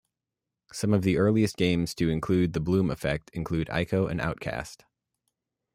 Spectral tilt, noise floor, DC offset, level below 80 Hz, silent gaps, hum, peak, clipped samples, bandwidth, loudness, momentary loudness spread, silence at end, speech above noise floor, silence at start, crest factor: -6.5 dB/octave; -88 dBFS; under 0.1%; -50 dBFS; none; none; -10 dBFS; under 0.1%; 16 kHz; -27 LUFS; 10 LU; 1 s; 62 dB; 0.75 s; 18 dB